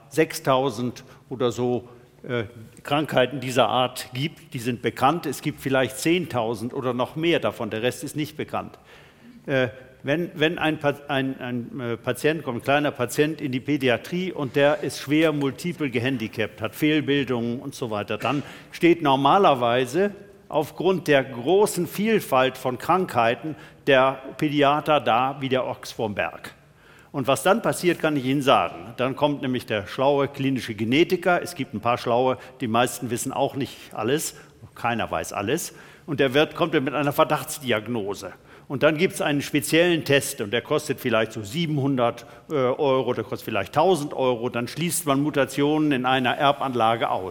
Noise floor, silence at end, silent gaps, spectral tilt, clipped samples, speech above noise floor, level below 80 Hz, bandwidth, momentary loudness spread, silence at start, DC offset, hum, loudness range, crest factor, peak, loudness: -52 dBFS; 0 s; none; -5 dB/octave; under 0.1%; 28 dB; -62 dBFS; 18 kHz; 10 LU; 0.1 s; under 0.1%; none; 4 LU; 20 dB; -4 dBFS; -23 LUFS